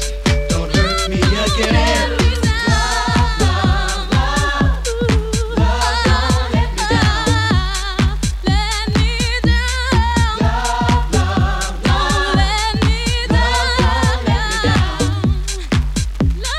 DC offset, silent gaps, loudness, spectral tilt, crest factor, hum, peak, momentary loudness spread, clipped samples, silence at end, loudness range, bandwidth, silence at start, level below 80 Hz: under 0.1%; none; -16 LUFS; -4.5 dB/octave; 14 dB; none; 0 dBFS; 4 LU; under 0.1%; 0 s; 1 LU; 14 kHz; 0 s; -20 dBFS